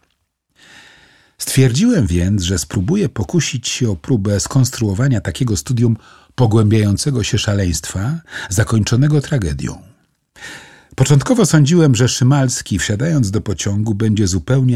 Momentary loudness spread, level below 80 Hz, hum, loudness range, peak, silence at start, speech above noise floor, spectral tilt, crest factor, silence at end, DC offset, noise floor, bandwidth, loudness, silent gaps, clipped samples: 10 LU; -36 dBFS; none; 3 LU; -2 dBFS; 1.4 s; 52 dB; -5.5 dB/octave; 14 dB; 0 s; 0.3%; -67 dBFS; 15 kHz; -16 LUFS; none; under 0.1%